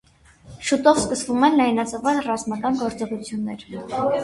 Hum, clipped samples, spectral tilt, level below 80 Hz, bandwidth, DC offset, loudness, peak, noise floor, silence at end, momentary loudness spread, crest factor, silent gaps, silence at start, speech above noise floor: none; under 0.1%; -4 dB/octave; -54 dBFS; 11.5 kHz; under 0.1%; -22 LUFS; -2 dBFS; -48 dBFS; 0 s; 12 LU; 20 dB; none; 0.45 s; 27 dB